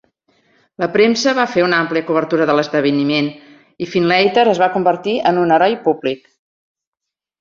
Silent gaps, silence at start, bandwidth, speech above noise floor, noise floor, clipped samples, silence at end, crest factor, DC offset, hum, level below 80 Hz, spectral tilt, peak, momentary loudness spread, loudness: none; 0.8 s; 7.6 kHz; 68 dB; -83 dBFS; under 0.1%; 1.25 s; 16 dB; under 0.1%; none; -60 dBFS; -5 dB/octave; -2 dBFS; 8 LU; -15 LUFS